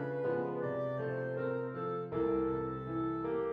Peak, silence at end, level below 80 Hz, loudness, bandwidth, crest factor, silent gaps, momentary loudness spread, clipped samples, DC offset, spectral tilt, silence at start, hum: -22 dBFS; 0 s; -60 dBFS; -36 LUFS; 4.9 kHz; 12 dB; none; 4 LU; under 0.1%; under 0.1%; -10 dB/octave; 0 s; none